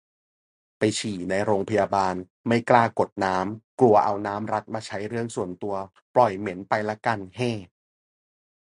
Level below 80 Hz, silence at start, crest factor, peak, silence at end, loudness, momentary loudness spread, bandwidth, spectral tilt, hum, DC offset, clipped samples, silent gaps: -58 dBFS; 0.8 s; 24 dB; -2 dBFS; 1.15 s; -25 LUFS; 12 LU; 11 kHz; -5.5 dB/octave; none; under 0.1%; under 0.1%; 2.30-2.44 s, 3.12-3.16 s, 3.64-3.78 s, 6.02-6.14 s